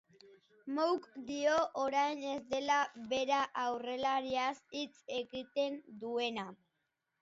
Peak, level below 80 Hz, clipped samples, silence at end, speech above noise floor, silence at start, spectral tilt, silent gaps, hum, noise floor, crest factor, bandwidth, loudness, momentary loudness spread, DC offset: -18 dBFS; -76 dBFS; under 0.1%; 0.65 s; 49 dB; 0.25 s; -1 dB/octave; none; none; -85 dBFS; 18 dB; 7.6 kHz; -36 LUFS; 10 LU; under 0.1%